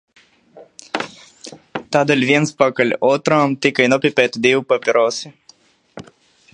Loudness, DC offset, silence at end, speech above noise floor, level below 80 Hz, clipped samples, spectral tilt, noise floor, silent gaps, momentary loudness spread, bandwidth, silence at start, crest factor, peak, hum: -16 LUFS; under 0.1%; 0.55 s; 36 dB; -64 dBFS; under 0.1%; -4.5 dB/octave; -52 dBFS; none; 16 LU; 10 kHz; 0.55 s; 18 dB; 0 dBFS; none